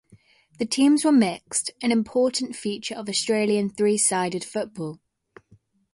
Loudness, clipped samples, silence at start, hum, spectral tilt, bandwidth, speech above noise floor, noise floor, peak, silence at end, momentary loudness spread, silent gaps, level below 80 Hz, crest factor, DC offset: -23 LUFS; under 0.1%; 0.6 s; none; -3.5 dB/octave; 11.5 kHz; 36 dB; -59 dBFS; -8 dBFS; 1 s; 12 LU; none; -66 dBFS; 16 dB; under 0.1%